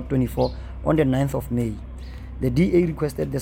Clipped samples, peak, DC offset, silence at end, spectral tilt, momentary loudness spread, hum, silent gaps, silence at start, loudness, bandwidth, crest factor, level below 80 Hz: under 0.1%; -8 dBFS; under 0.1%; 0 s; -8 dB/octave; 16 LU; none; none; 0 s; -23 LUFS; 17 kHz; 16 dB; -36 dBFS